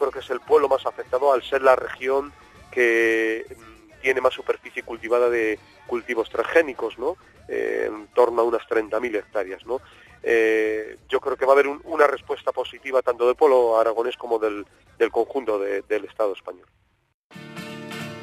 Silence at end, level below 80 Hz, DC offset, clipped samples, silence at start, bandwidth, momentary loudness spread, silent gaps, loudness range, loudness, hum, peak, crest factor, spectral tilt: 0 s; -58 dBFS; under 0.1%; under 0.1%; 0 s; 14 kHz; 13 LU; 17.14-17.30 s; 4 LU; -23 LUFS; none; -2 dBFS; 20 dB; -4.5 dB/octave